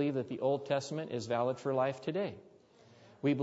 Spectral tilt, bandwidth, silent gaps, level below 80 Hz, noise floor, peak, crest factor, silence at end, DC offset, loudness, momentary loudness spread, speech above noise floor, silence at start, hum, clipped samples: -6 dB/octave; 7.6 kHz; none; -78 dBFS; -61 dBFS; -18 dBFS; 16 dB; 0 s; under 0.1%; -35 LUFS; 6 LU; 27 dB; 0 s; none; under 0.1%